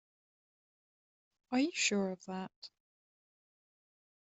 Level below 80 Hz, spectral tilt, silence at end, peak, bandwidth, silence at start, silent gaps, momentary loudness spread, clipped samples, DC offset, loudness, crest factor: -84 dBFS; -3 dB/octave; 1.55 s; -18 dBFS; 8.2 kHz; 1.5 s; 2.56-2.62 s; 20 LU; under 0.1%; under 0.1%; -35 LUFS; 22 dB